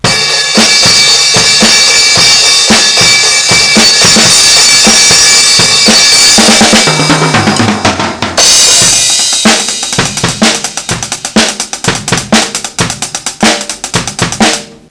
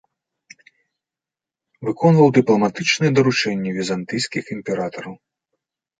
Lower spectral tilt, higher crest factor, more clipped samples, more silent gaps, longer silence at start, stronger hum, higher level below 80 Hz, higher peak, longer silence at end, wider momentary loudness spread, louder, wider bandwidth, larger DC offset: second, -1 dB/octave vs -5.5 dB/octave; second, 6 dB vs 18 dB; first, 2% vs under 0.1%; neither; second, 0.05 s vs 1.8 s; neither; first, -36 dBFS vs -62 dBFS; about the same, 0 dBFS vs -2 dBFS; second, 0.2 s vs 0.85 s; second, 11 LU vs 14 LU; first, -4 LUFS vs -19 LUFS; first, 11 kHz vs 9.4 kHz; neither